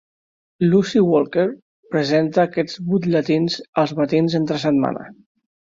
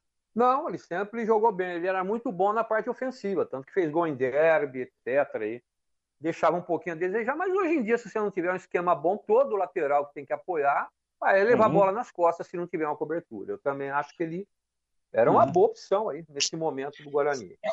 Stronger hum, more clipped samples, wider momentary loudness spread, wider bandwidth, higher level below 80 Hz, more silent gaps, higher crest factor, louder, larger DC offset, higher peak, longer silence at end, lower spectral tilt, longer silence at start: neither; neither; second, 7 LU vs 11 LU; about the same, 7.6 kHz vs 8.2 kHz; first, -60 dBFS vs -72 dBFS; first, 1.62-1.83 s, 3.68-3.73 s vs none; about the same, 16 dB vs 18 dB; first, -19 LUFS vs -27 LUFS; neither; first, -4 dBFS vs -10 dBFS; first, 0.65 s vs 0 s; first, -7 dB/octave vs -5 dB/octave; first, 0.6 s vs 0.35 s